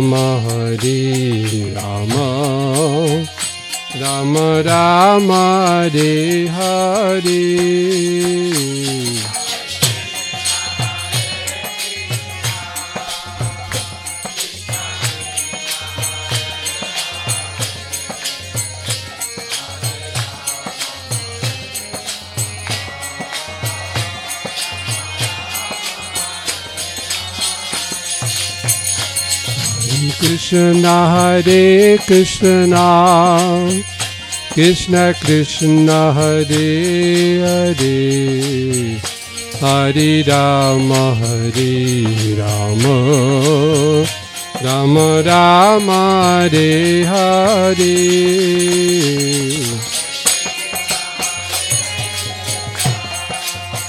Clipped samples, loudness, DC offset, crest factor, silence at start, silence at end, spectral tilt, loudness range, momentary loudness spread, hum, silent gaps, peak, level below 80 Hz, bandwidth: under 0.1%; -15 LUFS; under 0.1%; 14 dB; 0 s; 0 s; -4.5 dB/octave; 11 LU; 12 LU; none; none; 0 dBFS; -48 dBFS; 17 kHz